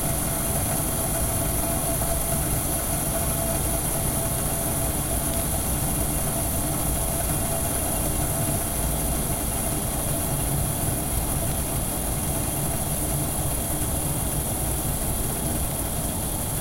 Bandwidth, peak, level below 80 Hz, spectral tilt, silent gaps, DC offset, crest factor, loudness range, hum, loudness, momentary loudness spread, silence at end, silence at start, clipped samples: 16.5 kHz; -10 dBFS; -32 dBFS; -4 dB/octave; none; under 0.1%; 14 dB; 1 LU; none; -24 LUFS; 2 LU; 0 s; 0 s; under 0.1%